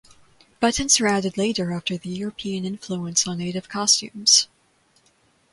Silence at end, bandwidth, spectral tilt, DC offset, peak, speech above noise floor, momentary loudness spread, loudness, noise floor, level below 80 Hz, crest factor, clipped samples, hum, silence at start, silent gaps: 1.1 s; 11.5 kHz; -2.5 dB/octave; under 0.1%; -2 dBFS; 39 dB; 13 LU; -21 LUFS; -62 dBFS; -52 dBFS; 22 dB; under 0.1%; none; 0.6 s; none